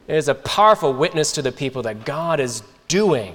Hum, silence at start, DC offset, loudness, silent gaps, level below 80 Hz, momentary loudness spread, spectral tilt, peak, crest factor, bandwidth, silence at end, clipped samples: none; 0.1 s; under 0.1%; -19 LUFS; none; -52 dBFS; 11 LU; -4 dB/octave; -2 dBFS; 18 dB; 18.5 kHz; 0 s; under 0.1%